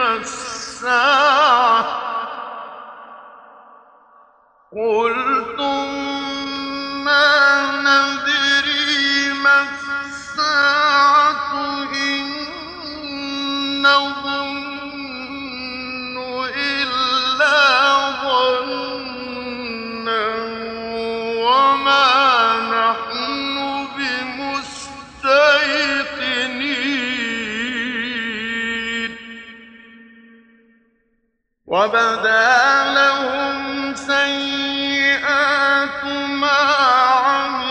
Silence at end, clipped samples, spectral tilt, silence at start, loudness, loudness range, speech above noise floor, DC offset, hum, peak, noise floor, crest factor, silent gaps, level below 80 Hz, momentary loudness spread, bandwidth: 0 s; under 0.1%; -2 dB/octave; 0 s; -17 LUFS; 8 LU; 52 dB; under 0.1%; none; -2 dBFS; -69 dBFS; 16 dB; none; -56 dBFS; 14 LU; 9.8 kHz